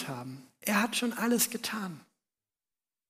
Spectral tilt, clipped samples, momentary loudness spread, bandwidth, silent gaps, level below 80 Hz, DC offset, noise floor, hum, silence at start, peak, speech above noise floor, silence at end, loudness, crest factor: -3 dB/octave; under 0.1%; 15 LU; 15.5 kHz; none; -82 dBFS; under 0.1%; under -90 dBFS; none; 0 s; -10 dBFS; over 58 dB; 1.05 s; -30 LUFS; 24 dB